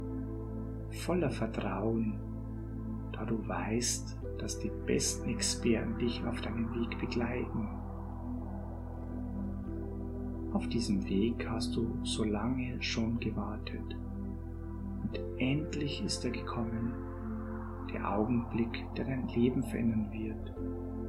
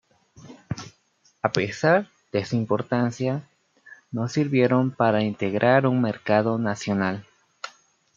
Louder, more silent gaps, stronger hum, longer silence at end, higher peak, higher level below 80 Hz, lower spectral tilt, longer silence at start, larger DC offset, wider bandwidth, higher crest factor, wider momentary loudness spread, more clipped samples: second, -36 LUFS vs -23 LUFS; neither; neither; second, 0 s vs 0.45 s; second, -16 dBFS vs -2 dBFS; first, -44 dBFS vs -64 dBFS; second, -5 dB/octave vs -6.5 dB/octave; second, 0 s vs 0.45 s; neither; first, 15.5 kHz vs 7.6 kHz; about the same, 18 dB vs 22 dB; second, 9 LU vs 16 LU; neither